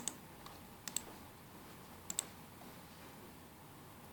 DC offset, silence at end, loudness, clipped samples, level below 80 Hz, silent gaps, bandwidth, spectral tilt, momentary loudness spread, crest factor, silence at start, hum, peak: under 0.1%; 0 s; -48 LUFS; under 0.1%; -70 dBFS; none; over 20 kHz; -2 dB/octave; 13 LU; 34 dB; 0 s; none; -16 dBFS